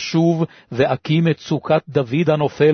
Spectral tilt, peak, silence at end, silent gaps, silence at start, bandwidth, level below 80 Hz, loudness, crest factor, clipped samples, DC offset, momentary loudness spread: -7 dB/octave; -4 dBFS; 0 s; none; 0 s; 6.6 kHz; -56 dBFS; -19 LUFS; 14 dB; under 0.1%; under 0.1%; 5 LU